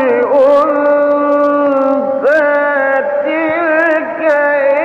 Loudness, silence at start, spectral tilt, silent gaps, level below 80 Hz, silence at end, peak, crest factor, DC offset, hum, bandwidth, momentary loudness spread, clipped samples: -11 LUFS; 0 s; -6 dB/octave; none; -58 dBFS; 0 s; -4 dBFS; 8 dB; under 0.1%; none; 6.2 kHz; 4 LU; under 0.1%